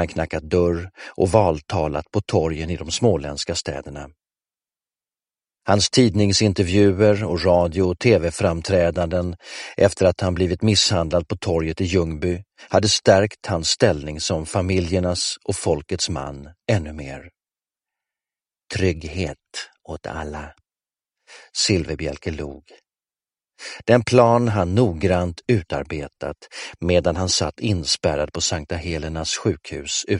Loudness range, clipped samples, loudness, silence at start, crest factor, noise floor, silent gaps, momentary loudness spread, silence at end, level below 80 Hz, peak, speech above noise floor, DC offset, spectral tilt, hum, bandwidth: 9 LU; under 0.1%; -20 LUFS; 0 s; 20 dB; under -90 dBFS; none; 15 LU; 0 s; -40 dBFS; 0 dBFS; over 69 dB; under 0.1%; -4.5 dB/octave; none; 11.5 kHz